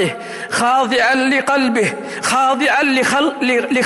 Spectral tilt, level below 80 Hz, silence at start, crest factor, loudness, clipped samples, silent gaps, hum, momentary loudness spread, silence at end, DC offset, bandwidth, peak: -3 dB/octave; -58 dBFS; 0 s; 10 dB; -15 LUFS; under 0.1%; none; none; 7 LU; 0 s; under 0.1%; 15.5 kHz; -6 dBFS